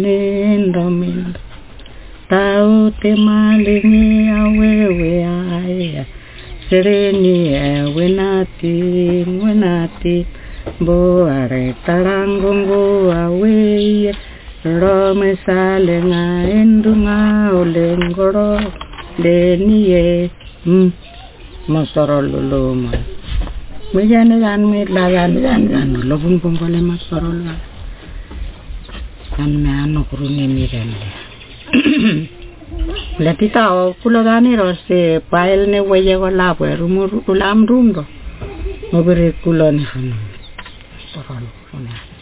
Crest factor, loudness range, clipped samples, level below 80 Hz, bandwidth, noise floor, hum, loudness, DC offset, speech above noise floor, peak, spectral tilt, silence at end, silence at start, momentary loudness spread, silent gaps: 12 dB; 5 LU; under 0.1%; -30 dBFS; 4 kHz; -34 dBFS; none; -14 LUFS; under 0.1%; 22 dB; -2 dBFS; -11.5 dB/octave; 0.05 s; 0 s; 19 LU; none